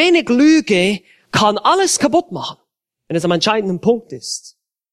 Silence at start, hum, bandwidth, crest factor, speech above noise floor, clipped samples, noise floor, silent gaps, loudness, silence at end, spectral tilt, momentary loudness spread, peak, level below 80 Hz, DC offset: 0 s; none; 13.5 kHz; 16 dB; 55 dB; under 0.1%; -70 dBFS; none; -15 LUFS; 0.45 s; -4 dB/octave; 14 LU; 0 dBFS; -56 dBFS; under 0.1%